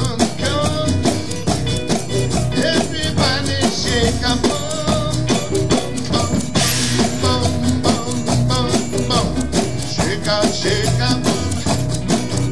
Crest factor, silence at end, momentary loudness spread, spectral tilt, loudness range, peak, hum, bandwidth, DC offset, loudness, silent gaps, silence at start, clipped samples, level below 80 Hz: 16 dB; 0 s; 3 LU; -4.5 dB/octave; 1 LU; -2 dBFS; none; 12 kHz; 4%; -18 LUFS; none; 0 s; under 0.1%; -34 dBFS